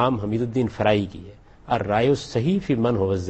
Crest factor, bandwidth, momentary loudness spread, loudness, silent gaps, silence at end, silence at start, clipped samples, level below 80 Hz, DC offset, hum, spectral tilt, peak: 16 dB; 8.6 kHz; 6 LU; -23 LUFS; none; 0 s; 0 s; under 0.1%; -48 dBFS; under 0.1%; none; -7 dB/octave; -6 dBFS